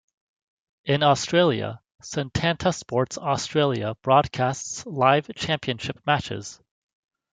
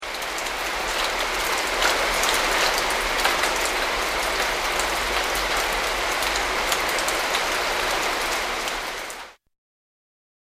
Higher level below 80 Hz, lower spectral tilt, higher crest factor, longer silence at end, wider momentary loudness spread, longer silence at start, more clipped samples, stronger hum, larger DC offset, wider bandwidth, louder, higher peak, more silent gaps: second, -56 dBFS vs -42 dBFS; first, -4.5 dB/octave vs -0.5 dB/octave; about the same, 20 dB vs 22 dB; second, 0.8 s vs 1.15 s; first, 12 LU vs 6 LU; first, 0.85 s vs 0 s; neither; neither; neither; second, 9.6 kHz vs 15.5 kHz; about the same, -24 LUFS vs -22 LUFS; about the same, -4 dBFS vs -2 dBFS; neither